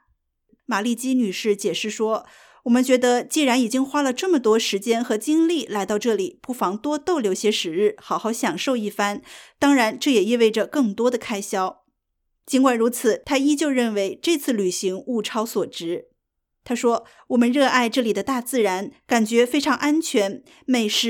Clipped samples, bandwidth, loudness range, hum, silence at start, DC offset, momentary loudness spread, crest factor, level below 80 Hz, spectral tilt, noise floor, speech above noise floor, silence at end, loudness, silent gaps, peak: under 0.1%; 18.5 kHz; 3 LU; none; 0.7 s; under 0.1%; 8 LU; 18 dB; -66 dBFS; -3.5 dB/octave; -77 dBFS; 56 dB; 0 s; -21 LUFS; none; -4 dBFS